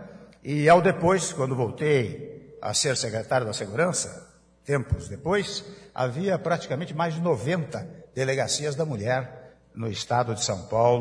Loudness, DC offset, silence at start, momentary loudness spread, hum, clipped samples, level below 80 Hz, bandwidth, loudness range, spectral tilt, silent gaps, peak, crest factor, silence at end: -26 LUFS; under 0.1%; 0 s; 14 LU; none; under 0.1%; -50 dBFS; 11 kHz; 4 LU; -4.5 dB/octave; none; -6 dBFS; 20 dB; 0 s